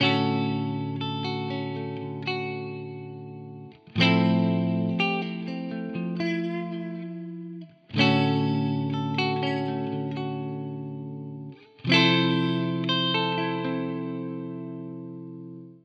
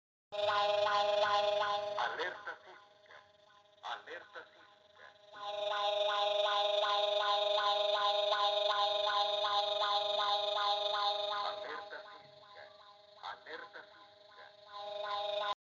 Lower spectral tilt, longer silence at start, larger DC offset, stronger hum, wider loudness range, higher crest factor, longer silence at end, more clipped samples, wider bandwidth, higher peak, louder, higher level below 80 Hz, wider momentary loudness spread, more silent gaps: first, -6.5 dB/octave vs -1 dB/octave; second, 0 s vs 0.3 s; neither; neither; second, 5 LU vs 15 LU; first, 22 dB vs 16 dB; about the same, 0.05 s vs 0.1 s; neither; about the same, 7.4 kHz vs 7.6 kHz; first, -6 dBFS vs -20 dBFS; first, -27 LUFS vs -33 LUFS; first, -72 dBFS vs -84 dBFS; about the same, 17 LU vs 18 LU; neither